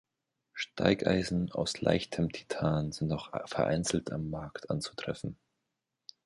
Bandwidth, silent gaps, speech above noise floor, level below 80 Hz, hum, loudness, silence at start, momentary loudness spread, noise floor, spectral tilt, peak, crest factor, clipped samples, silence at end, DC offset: 11.5 kHz; none; 54 dB; -54 dBFS; none; -33 LUFS; 0.55 s; 10 LU; -85 dBFS; -5.5 dB/octave; -8 dBFS; 24 dB; under 0.1%; 0.9 s; under 0.1%